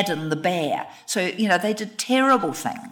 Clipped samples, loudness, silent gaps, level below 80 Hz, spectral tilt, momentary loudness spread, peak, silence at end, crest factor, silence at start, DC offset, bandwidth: under 0.1%; -22 LUFS; none; -72 dBFS; -4 dB/octave; 9 LU; -8 dBFS; 0 s; 16 dB; 0 s; under 0.1%; 19 kHz